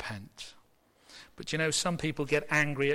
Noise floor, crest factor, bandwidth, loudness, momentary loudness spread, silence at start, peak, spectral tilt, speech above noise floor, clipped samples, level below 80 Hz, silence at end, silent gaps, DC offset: -65 dBFS; 16 dB; 16 kHz; -30 LUFS; 20 LU; 0 s; -16 dBFS; -3.5 dB/octave; 34 dB; under 0.1%; -58 dBFS; 0 s; none; under 0.1%